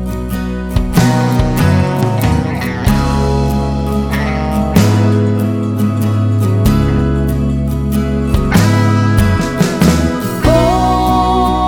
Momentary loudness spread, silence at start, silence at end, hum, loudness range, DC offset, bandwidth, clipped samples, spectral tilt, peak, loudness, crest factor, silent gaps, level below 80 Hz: 5 LU; 0 s; 0 s; none; 2 LU; under 0.1%; 18.5 kHz; under 0.1%; -6.5 dB/octave; 0 dBFS; -13 LUFS; 12 dB; none; -20 dBFS